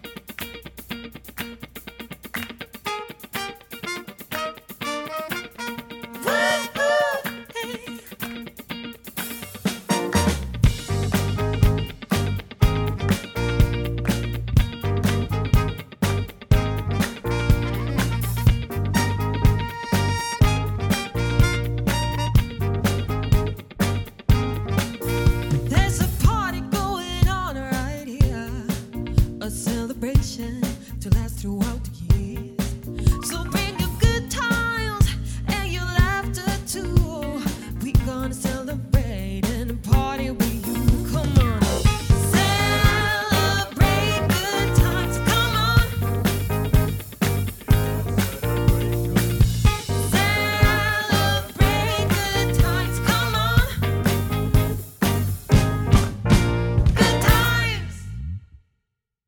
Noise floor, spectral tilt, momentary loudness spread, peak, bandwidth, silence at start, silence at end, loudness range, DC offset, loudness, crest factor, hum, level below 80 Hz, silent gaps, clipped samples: -79 dBFS; -5.5 dB/octave; 12 LU; -4 dBFS; 20 kHz; 0.05 s; 0.85 s; 6 LU; under 0.1%; -22 LUFS; 18 dB; none; -28 dBFS; none; under 0.1%